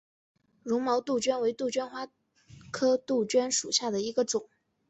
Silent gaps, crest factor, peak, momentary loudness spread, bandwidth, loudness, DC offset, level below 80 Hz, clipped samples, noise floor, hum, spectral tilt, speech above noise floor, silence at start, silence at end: none; 18 dB; -12 dBFS; 13 LU; 8.4 kHz; -29 LUFS; under 0.1%; -72 dBFS; under 0.1%; -55 dBFS; none; -2.5 dB/octave; 26 dB; 0.65 s; 0.45 s